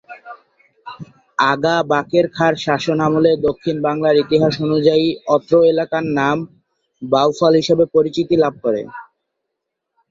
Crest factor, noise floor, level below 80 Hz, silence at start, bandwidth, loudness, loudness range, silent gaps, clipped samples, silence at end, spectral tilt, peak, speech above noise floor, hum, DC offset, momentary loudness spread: 16 dB; -78 dBFS; -54 dBFS; 0.1 s; 7.6 kHz; -16 LUFS; 2 LU; none; under 0.1%; 1.1 s; -6 dB/octave; -2 dBFS; 62 dB; none; under 0.1%; 20 LU